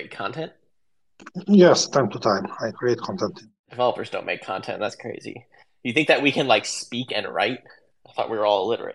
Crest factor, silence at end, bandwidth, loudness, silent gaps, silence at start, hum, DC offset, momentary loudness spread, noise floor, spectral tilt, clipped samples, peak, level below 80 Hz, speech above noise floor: 20 dB; 0 s; 11.5 kHz; -22 LUFS; 3.59-3.64 s; 0 s; none; under 0.1%; 17 LU; -82 dBFS; -4.5 dB/octave; under 0.1%; -2 dBFS; -70 dBFS; 59 dB